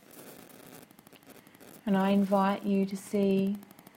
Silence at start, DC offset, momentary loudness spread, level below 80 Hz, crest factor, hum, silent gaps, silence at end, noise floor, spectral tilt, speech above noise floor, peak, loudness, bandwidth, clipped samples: 0.15 s; under 0.1%; 24 LU; -72 dBFS; 18 dB; none; none; 0.3 s; -55 dBFS; -7 dB/octave; 28 dB; -14 dBFS; -29 LUFS; 17 kHz; under 0.1%